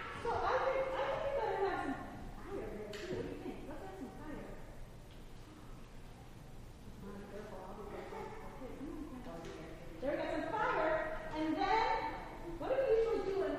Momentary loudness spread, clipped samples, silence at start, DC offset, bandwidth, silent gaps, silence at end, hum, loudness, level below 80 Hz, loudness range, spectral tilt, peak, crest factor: 21 LU; under 0.1%; 0 s; under 0.1%; 15.5 kHz; none; 0 s; none; -39 LUFS; -52 dBFS; 16 LU; -6 dB/octave; -22 dBFS; 18 dB